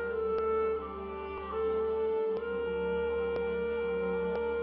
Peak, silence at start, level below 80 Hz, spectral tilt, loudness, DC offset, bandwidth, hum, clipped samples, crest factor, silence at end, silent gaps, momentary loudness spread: -22 dBFS; 0 s; -52 dBFS; -9.5 dB/octave; -33 LUFS; under 0.1%; 5 kHz; none; under 0.1%; 10 dB; 0 s; none; 6 LU